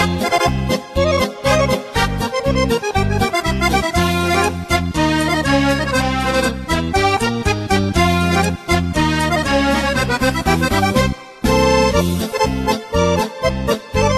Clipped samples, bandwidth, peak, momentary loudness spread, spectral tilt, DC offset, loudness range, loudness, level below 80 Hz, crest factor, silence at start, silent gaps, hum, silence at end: under 0.1%; 14 kHz; 0 dBFS; 4 LU; -5 dB/octave; under 0.1%; 1 LU; -17 LUFS; -28 dBFS; 16 dB; 0 s; none; none; 0 s